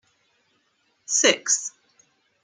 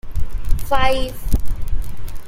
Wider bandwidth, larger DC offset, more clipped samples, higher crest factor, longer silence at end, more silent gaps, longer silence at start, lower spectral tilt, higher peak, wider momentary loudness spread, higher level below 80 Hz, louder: second, 10.5 kHz vs 16 kHz; neither; neither; first, 24 dB vs 14 dB; first, 0.75 s vs 0 s; neither; first, 1.1 s vs 0.05 s; second, 0.5 dB/octave vs -5 dB/octave; about the same, -4 dBFS vs -2 dBFS; first, 18 LU vs 11 LU; second, -82 dBFS vs -22 dBFS; first, -20 LUFS vs -23 LUFS